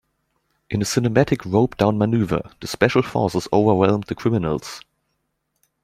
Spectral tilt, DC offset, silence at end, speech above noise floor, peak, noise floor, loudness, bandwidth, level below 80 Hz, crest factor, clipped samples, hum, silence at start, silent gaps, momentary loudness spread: -6 dB/octave; under 0.1%; 1.05 s; 54 dB; -2 dBFS; -73 dBFS; -20 LUFS; 15.5 kHz; -48 dBFS; 20 dB; under 0.1%; none; 0.7 s; none; 9 LU